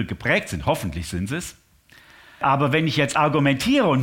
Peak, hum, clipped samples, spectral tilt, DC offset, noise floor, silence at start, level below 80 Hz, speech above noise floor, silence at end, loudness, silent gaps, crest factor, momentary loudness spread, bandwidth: -6 dBFS; none; under 0.1%; -5.5 dB/octave; under 0.1%; -53 dBFS; 0 s; -44 dBFS; 32 dB; 0 s; -21 LUFS; none; 16 dB; 10 LU; 17 kHz